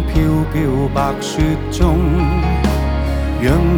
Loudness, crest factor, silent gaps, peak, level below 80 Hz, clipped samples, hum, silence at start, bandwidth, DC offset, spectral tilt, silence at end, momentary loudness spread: -17 LUFS; 14 dB; none; 0 dBFS; -20 dBFS; under 0.1%; none; 0 s; 17.5 kHz; under 0.1%; -7 dB/octave; 0 s; 4 LU